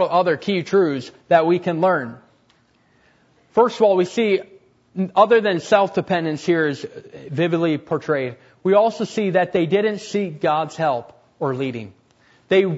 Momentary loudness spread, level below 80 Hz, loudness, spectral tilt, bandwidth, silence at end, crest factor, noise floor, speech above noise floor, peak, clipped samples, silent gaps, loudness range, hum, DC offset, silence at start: 11 LU; -66 dBFS; -20 LUFS; -6.5 dB/octave; 8 kHz; 0 s; 18 dB; -59 dBFS; 40 dB; -2 dBFS; under 0.1%; none; 3 LU; none; under 0.1%; 0 s